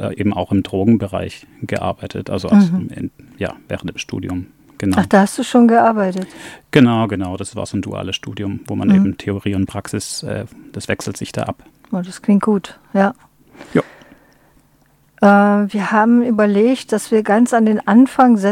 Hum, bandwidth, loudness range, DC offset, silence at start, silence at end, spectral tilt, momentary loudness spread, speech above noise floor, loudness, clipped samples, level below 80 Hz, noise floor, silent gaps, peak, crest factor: none; 13.5 kHz; 6 LU; under 0.1%; 0 s; 0 s; -6.5 dB/octave; 14 LU; 39 dB; -16 LUFS; under 0.1%; -50 dBFS; -55 dBFS; none; 0 dBFS; 16 dB